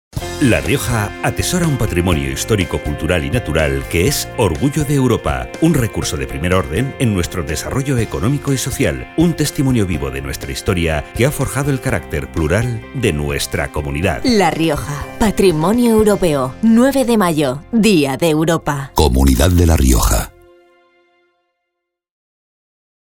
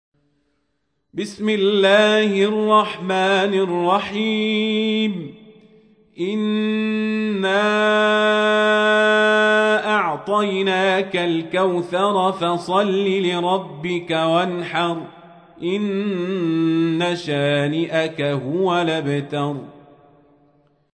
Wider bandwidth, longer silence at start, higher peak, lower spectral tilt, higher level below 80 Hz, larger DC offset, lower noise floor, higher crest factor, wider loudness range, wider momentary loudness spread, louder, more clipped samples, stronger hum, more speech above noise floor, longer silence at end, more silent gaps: first, 19 kHz vs 10 kHz; second, 0.15 s vs 1.15 s; first, 0 dBFS vs -4 dBFS; about the same, -5.5 dB/octave vs -5.5 dB/octave; first, -26 dBFS vs -66 dBFS; neither; first, -77 dBFS vs -72 dBFS; about the same, 16 dB vs 16 dB; about the same, 4 LU vs 6 LU; about the same, 8 LU vs 9 LU; first, -16 LUFS vs -19 LUFS; neither; neither; first, 61 dB vs 53 dB; first, 2.8 s vs 1.25 s; neither